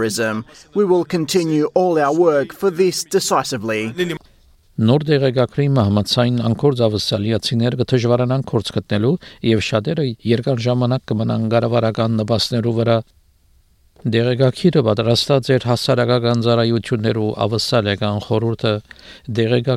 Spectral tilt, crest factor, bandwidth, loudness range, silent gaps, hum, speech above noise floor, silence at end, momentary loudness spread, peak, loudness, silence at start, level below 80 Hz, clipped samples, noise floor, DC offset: -6 dB/octave; 14 dB; 16 kHz; 2 LU; none; none; 38 dB; 0 s; 6 LU; -2 dBFS; -18 LUFS; 0 s; -52 dBFS; under 0.1%; -54 dBFS; under 0.1%